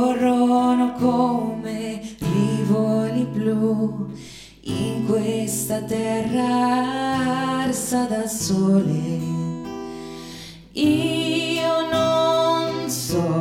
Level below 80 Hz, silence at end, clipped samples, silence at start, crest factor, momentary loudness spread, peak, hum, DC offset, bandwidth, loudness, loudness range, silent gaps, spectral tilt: -52 dBFS; 0 s; under 0.1%; 0 s; 14 dB; 13 LU; -6 dBFS; none; under 0.1%; 16.5 kHz; -21 LUFS; 3 LU; none; -5.5 dB/octave